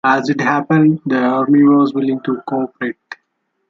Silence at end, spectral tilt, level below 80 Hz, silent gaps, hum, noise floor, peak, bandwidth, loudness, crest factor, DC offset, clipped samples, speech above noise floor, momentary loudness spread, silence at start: 0.55 s; -7.5 dB/octave; -60 dBFS; none; none; -69 dBFS; -2 dBFS; 7.2 kHz; -15 LUFS; 14 dB; under 0.1%; under 0.1%; 55 dB; 14 LU; 0.05 s